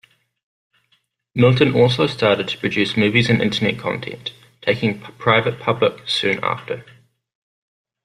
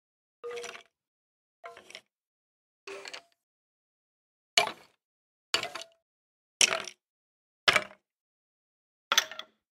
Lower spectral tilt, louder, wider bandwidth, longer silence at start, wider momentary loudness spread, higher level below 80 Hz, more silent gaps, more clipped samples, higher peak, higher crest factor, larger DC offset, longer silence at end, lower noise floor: first, -6 dB/octave vs 1 dB/octave; first, -18 LUFS vs -28 LUFS; second, 11 kHz vs 16 kHz; first, 1.35 s vs 0.45 s; second, 13 LU vs 25 LU; first, -54 dBFS vs -76 dBFS; second, none vs 1.07-1.63 s, 2.17-2.87 s, 3.43-4.57 s, 5.04-5.53 s, 6.02-6.60 s, 7.06-7.67 s, 8.20-9.11 s; neither; first, -2 dBFS vs -6 dBFS; second, 18 dB vs 30 dB; neither; first, 1.2 s vs 0.35 s; first, -65 dBFS vs -53 dBFS